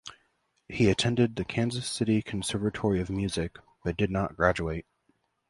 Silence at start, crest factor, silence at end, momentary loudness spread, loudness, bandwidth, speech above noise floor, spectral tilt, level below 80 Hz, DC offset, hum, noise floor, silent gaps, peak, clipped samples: 0.05 s; 22 dB; 0.7 s; 11 LU; -29 LUFS; 11.5 kHz; 45 dB; -5.5 dB/octave; -48 dBFS; under 0.1%; none; -72 dBFS; none; -6 dBFS; under 0.1%